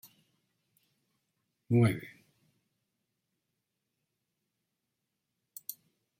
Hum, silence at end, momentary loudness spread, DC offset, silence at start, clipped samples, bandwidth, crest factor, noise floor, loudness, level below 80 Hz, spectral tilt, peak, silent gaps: none; 0.45 s; 24 LU; under 0.1%; 1.7 s; under 0.1%; 16.5 kHz; 24 dB; -85 dBFS; -29 LUFS; -74 dBFS; -7.5 dB/octave; -16 dBFS; none